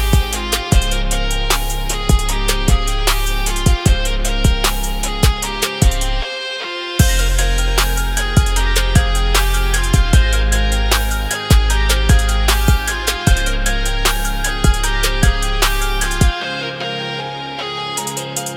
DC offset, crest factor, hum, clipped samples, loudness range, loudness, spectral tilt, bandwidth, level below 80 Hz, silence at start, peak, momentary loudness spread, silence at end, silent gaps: under 0.1%; 14 dB; none; under 0.1%; 2 LU; -17 LUFS; -3.5 dB/octave; 17.5 kHz; -16 dBFS; 0 s; 0 dBFS; 7 LU; 0 s; none